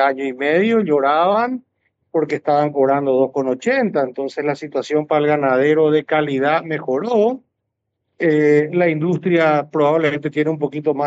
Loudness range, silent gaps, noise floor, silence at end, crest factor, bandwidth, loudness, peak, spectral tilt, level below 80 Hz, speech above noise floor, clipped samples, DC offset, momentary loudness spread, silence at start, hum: 1 LU; none; -76 dBFS; 0 s; 14 dB; 7.8 kHz; -17 LUFS; -4 dBFS; -7 dB/octave; -70 dBFS; 59 dB; under 0.1%; under 0.1%; 7 LU; 0 s; none